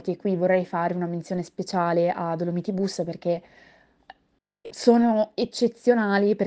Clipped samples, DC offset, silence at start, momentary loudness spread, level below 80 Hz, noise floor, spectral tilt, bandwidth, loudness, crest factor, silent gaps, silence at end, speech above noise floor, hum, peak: under 0.1%; under 0.1%; 0.05 s; 9 LU; -68 dBFS; -70 dBFS; -6.5 dB/octave; 9.4 kHz; -24 LUFS; 18 dB; none; 0 s; 46 dB; none; -6 dBFS